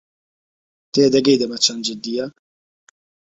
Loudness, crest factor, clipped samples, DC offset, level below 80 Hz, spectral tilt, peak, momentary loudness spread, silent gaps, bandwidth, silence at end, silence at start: -18 LUFS; 20 dB; under 0.1%; under 0.1%; -62 dBFS; -3.5 dB/octave; 0 dBFS; 11 LU; none; 8 kHz; 0.95 s; 0.95 s